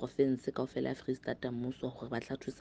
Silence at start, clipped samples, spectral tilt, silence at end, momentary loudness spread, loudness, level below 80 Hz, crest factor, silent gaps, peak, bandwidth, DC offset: 0 s; under 0.1%; -7 dB/octave; 0 s; 8 LU; -37 LUFS; -64 dBFS; 20 dB; none; -18 dBFS; 9 kHz; under 0.1%